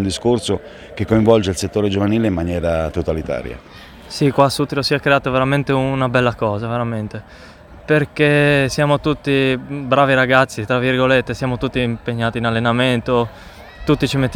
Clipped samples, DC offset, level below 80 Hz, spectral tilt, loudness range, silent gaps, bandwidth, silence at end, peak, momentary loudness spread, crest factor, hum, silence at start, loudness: under 0.1%; under 0.1%; -40 dBFS; -6 dB/octave; 3 LU; none; 17.5 kHz; 0 s; 0 dBFS; 11 LU; 18 dB; none; 0 s; -17 LUFS